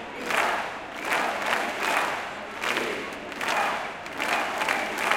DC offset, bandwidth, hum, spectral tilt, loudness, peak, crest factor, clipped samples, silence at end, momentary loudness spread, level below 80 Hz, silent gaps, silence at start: under 0.1%; 17 kHz; none; -2 dB/octave; -27 LUFS; -6 dBFS; 22 dB; under 0.1%; 0 s; 8 LU; -62 dBFS; none; 0 s